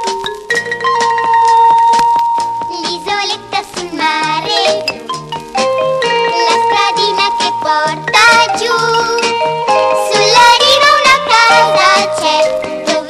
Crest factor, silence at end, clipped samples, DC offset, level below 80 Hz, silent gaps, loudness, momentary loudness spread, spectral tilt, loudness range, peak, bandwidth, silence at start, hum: 12 dB; 0 s; under 0.1%; under 0.1%; -50 dBFS; none; -10 LUFS; 11 LU; -1.5 dB/octave; 6 LU; 0 dBFS; 14 kHz; 0 s; none